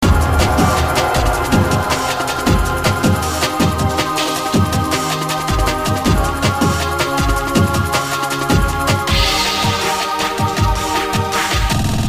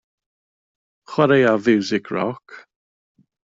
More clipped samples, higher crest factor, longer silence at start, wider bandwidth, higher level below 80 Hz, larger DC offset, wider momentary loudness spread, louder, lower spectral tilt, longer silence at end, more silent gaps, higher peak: neither; about the same, 16 dB vs 18 dB; second, 0 s vs 1.1 s; first, 15.5 kHz vs 7.8 kHz; first, -24 dBFS vs -64 dBFS; neither; second, 3 LU vs 12 LU; first, -16 LUFS vs -19 LUFS; second, -4.5 dB/octave vs -6.5 dB/octave; second, 0 s vs 0.9 s; neither; first, 0 dBFS vs -4 dBFS